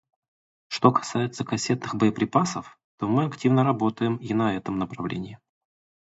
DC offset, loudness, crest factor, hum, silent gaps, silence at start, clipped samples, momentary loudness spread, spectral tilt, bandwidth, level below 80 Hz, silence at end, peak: under 0.1%; -25 LUFS; 24 dB; none; 2.84-2.98 s; 0.7 s; under 0.1%; 11 LU; -6 dB/octave; 8 kHz; -60 dBFS; 0.7 s; -2 dBFS